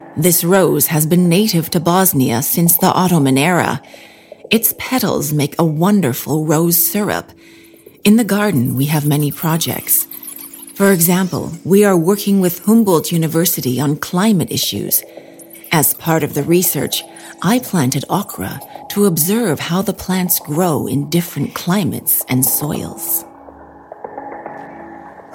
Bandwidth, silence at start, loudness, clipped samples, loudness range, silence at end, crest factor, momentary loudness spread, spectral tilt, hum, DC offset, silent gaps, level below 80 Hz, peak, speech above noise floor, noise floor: 17.5 kHz; 0 s; -14 LUFS; under 0.1%; 4 LU; 0 s; 16 dB; 12 LU; -4.5 dB/octave; none; under 0.1%; none; -52 dBFS; 0 dBFS; 24 dB; -38 dBFS